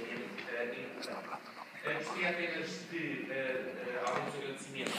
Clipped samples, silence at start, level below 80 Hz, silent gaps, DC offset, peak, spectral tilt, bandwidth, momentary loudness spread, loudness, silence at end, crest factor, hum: under 0.1%; 0 s; -86 dBFS; none; under 0.1%; -16 dBFS; -4 dB/octave; 15.5 kHz; 8 LU; -38 LUFS; 0 s; 22 dB; none